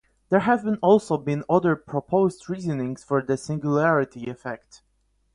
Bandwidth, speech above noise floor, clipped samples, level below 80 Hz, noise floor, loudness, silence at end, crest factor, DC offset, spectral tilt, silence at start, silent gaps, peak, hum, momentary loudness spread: 11 kHz; 45 dB; under 0.1%; -60 dBFS; -68 dBFS; -23 LUFS; 0.8 s; 18 dB; under 0.1%; -7.5 dB/octave; 0.3 s; none; -6 dBFS; none; 12 LU